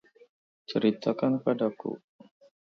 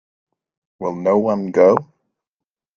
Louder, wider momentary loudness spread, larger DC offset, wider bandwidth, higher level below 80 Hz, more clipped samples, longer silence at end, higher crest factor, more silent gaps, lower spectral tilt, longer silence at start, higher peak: second, -29 LUFS vs -17 LUFS; about the same, 14 LU vs 12 LU; neither; about the same, 6.6 kHz vs 7.2 kHz; second, -76 dBFS vs -64 dBFS; neither; second, 0.7 s vs 0.95 s; about the same, 18 dB vs 20 dB; neither; about the same, -8 dB/octave vs -8.5 dB/octave; about the same, 0.7 s vs 0.8 s; second, -12 dBFS vs 0 dBFS